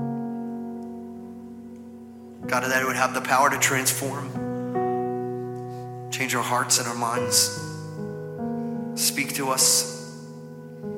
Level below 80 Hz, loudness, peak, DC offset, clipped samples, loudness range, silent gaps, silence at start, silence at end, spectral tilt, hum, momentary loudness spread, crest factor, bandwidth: -66 dBFS; -24 LUFS; -4 dBFS; under 0.1%; under 0.1%; 3 LU; none; 0 s; 0 s; -2.5 dB/octave; none; 21 LU; 22 dB; 16.5 kHz